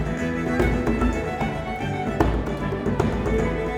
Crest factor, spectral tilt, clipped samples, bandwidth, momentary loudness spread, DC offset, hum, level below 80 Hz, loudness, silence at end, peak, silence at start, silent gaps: 18 dB; -7 dB/octave; under 0.1%; 14.5 kHz; 5 LU; under 0.1%; none; -30 dBFS; -24 LUFS; 0 s; -4 dBFS; 0 s; none